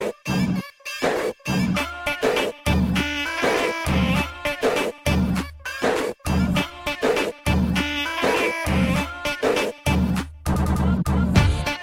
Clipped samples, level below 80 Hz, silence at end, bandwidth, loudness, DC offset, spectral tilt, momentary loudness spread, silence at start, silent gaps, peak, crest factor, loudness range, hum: under 0.1%; -32 dBFS; 0 s; 16.5 kHz; -22 LUFS; under 0.1%; -5.5 dB/octave; 5 LU; 0 s; none; -2 dBFS; 20 dB; 1 LU; none